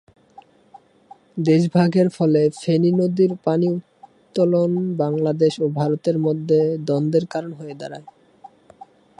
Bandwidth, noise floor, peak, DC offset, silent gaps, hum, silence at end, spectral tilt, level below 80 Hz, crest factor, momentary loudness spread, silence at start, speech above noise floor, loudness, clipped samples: 10.5 kHz; -50 dBFS; -4 dBFS; under 0.1%; none; none; 1.1 s; -8 dB/octave; -66 dBFS; 16 dB; 13 LU; 1.35 s; 31 dB; -19 LUFS; under 0.1%